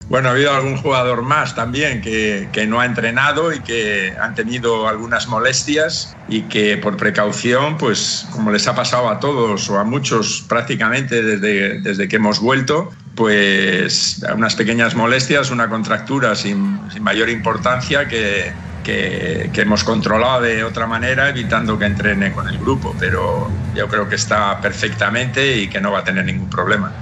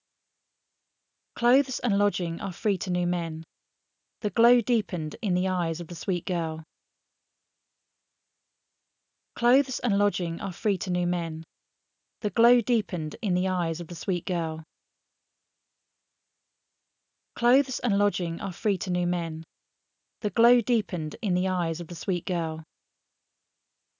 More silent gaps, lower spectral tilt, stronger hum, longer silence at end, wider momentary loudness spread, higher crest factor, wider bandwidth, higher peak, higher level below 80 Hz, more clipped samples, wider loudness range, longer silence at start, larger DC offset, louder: neither; second, -4 dB/octave vs -6 dB/octave; neither; second, 0 s vs 1.35 s; second, 5 LU vs 12 LU; about the same, 16 dB vs 20 dB; first, 9 kHz vs 7.4 kHz; first, 0 dBFS vs -8 dBFS; first, -44 dBFS vs -70 dBFS; neither; second, 3 LU vs 7 LU; second, 0 s vs 1.35 s; neither; first, -16 LUFS vs -27 LUFS